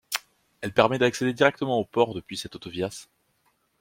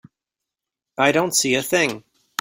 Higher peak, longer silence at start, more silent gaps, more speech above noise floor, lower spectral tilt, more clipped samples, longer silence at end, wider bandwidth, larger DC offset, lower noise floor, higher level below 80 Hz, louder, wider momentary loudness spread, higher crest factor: about the same, -2 dBFS vs -2 dBFS; second, 0.1 s vs 1 s; neither; second, 45 dB vs 66 dB; first, -4.5 dB/octave vs -2.5 dB/octave; neither; first, 0.8 s vs 0.4 s; about the same, 16.5 kHz vs 16.5 kHz; neither; second, -70 dBFS vs -86 dBFS; about the same, -62 dBFS vs -64 dBFS; second, -25 LUFS vs -19 LUFS; second, 13 LU vs 17 LU; about the same, 24 dB vs 22 dB